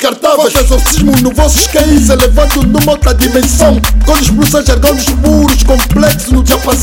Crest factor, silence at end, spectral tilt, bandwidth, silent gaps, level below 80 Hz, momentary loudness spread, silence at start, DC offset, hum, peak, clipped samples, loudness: 8 dB; 0 s; -4.5 dB/octave; over 20 kHz; none; -12 dBFS; 2 LU; 0 s; under 0.1%; none; 0 dBFS; 3%; -8 LUFS